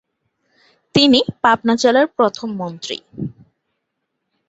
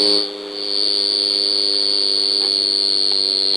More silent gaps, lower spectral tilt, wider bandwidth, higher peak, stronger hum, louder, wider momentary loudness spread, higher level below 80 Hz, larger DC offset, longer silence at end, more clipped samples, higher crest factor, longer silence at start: neither; first, -4.5 dB/octave vs -0.5 dB/octave; second, 8.2 kHz vs 11 kHz; first, 0 dBFS vs -4 dBFS; neither; about the same, -16 LUFS vs -15 LUFS; first, 16 LU vs 4 LU; first, -56 dBFS vs -68 dBFS; neither; first, 1.2 s vs 0 s; neither; about the same, 18 dB vs 14 dB; first, 0.95 s vs 0 s